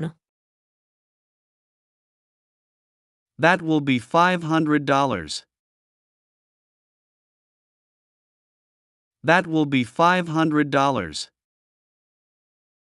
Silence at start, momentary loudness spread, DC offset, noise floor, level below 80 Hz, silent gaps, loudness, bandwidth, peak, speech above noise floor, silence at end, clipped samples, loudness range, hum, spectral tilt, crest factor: 0 s; 12 LU; under 0.1%; under -90 dBFS; -62 dBFS; 0.29-3.26 s, 5.59-9.11 s; -21 LUFS; 11.5 kHz; -2 dBFS; over 70 dB; 1.7 s; under 0.1%; 7 LU; none; -5.5 dB/octave; 24 dB